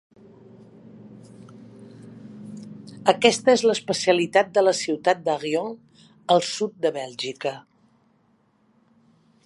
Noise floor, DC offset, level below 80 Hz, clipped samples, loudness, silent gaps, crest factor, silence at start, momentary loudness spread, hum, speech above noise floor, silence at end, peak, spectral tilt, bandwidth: -63 dBFS; under 0.1%; -72 dBFS; under 0.1%; -22 LUFS; none; 24 dB; 1.05 s; 23 LU; none; 42 dB; 1.85 s; 0 dBFS; -3.5 dB/octave; 11.5 kHz